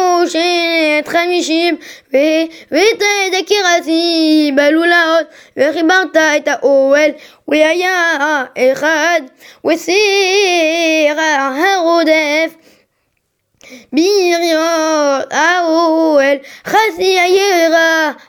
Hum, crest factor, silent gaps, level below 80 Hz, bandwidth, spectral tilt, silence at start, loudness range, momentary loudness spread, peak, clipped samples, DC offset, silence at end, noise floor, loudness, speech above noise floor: none; 12 dB; none; -62 dBFS; 19 kHz; -1.5 dB/octave; 0 s; 3 LU; 6 LU; 0 dBFS; under 0.1%; under 0.1%; 0.15 s; -66 dBFS; -12 LUFS; 53 dB